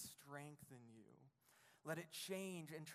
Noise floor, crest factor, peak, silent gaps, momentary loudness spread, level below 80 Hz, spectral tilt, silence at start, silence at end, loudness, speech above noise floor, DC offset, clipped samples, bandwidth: -74 dBFS; 22 dB; -32 dBFS; none; 17 LU; under -90 dBFS; -4 dB/octave; 0 s; 0 s; -52 LUFS; 23 dB; under 0.1%; under 0.1%; 15.5 kHz